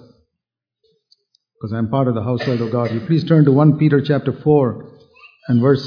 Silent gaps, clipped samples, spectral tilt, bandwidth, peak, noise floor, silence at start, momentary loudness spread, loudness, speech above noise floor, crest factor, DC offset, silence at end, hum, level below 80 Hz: none; under 0.1%; -10 dB/octave; 5.4 kHz; -2 dBFS; -82 dBFS; 1.65 s; 12 LU; -17 LUFS; 67 dB; 16 dB; under 0.1%; 0 s; none; -56 dBFS